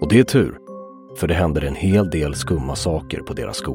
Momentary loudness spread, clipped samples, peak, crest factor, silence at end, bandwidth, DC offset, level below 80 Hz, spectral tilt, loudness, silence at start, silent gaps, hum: 18 LU; under 0.1%; -2 dBFS; 18 dB; 0 s; 17 kHz; under 0.1%; -34 dBFS; -6 dB/octave; -20 LUFS; 0 s; none; none